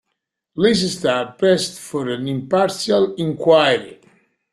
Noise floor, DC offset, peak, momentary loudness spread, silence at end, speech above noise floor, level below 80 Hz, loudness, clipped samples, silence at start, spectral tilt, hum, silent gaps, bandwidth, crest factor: -77 dBFS; under 0.1%; -2 dBFS; 10 LU; 0.6 s; 59 dB; -58 dBFS; -18 LUFS; under 0.1%; 0.55 s; -4.5 dB/octave; none; none; 13.5 kHz; 18 dB